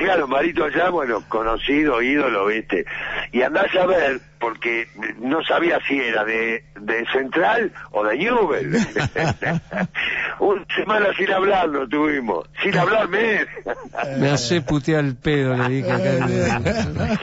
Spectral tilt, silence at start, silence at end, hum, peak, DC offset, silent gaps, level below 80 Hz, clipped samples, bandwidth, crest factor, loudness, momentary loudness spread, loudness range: -5.5 dB/octave; 0 s; 0 s; none; -8 dBFS; under 0.1%; none; -44 dBFS; under 0.1%; 8 kHz; 12 dB; -20 LUFS; 6 LU; 1 LU